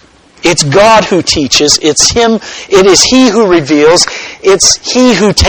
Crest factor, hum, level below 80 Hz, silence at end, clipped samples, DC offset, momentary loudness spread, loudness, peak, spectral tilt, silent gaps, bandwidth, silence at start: 8 dB; none; -28 dBFS; 0 s; 2%; 0.3%; 6 LU; -6 LUFS; 0 dBFS; -3 dB/octave; none; over 20 kHz; 0.45 s